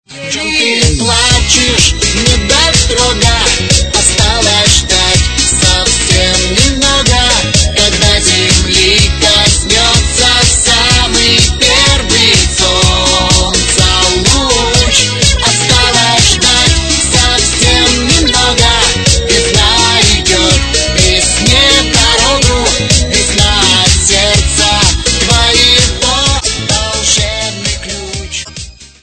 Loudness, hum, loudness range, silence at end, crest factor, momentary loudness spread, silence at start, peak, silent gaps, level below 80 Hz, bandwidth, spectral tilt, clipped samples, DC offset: -7 LUFS; none; 1 LU; 0.15 s; 8 dB; 4 LU; 0.1 s; 0 dBFS; none; -18 dBFS; 12 kHz; -2.5 dB/octave; 0.9%; 0.8%